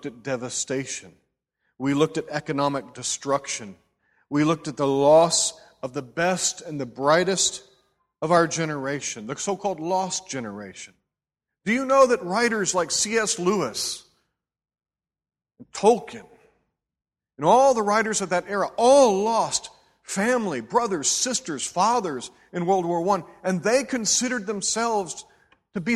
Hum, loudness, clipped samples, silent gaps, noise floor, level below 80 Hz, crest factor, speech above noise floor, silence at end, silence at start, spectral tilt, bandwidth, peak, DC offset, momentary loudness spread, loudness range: none; -23 LUFS; under 0.1%; none; under -90 dBFS; -64 dBFS; 20 dB; over 67 dB; 0 s; 0.05 s; -3 dB/octave; 14 kHz; -4 dBFS; under 0.1%; 15 LU; 6 LU